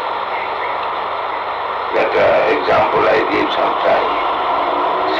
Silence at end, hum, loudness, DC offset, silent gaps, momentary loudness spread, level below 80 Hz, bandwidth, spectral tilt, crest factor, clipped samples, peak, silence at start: 0 s; none; -16 LUFS; under 0.1%; none; 8 LU; -48 dBFS; 7.8 kHz; -5.5 dB/octave; 10 dB; under 0.1%; -6 dBFS; 0 s